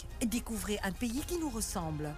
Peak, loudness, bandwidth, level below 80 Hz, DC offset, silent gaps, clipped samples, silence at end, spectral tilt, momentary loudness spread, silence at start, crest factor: -24 dBFS; -36 LUFS; 15.5 kHz; -46 dBFS; under 0.1%; none; under 0.1%; 0 s; -4 dB/octave; 2 LU; 0 s; 12 dB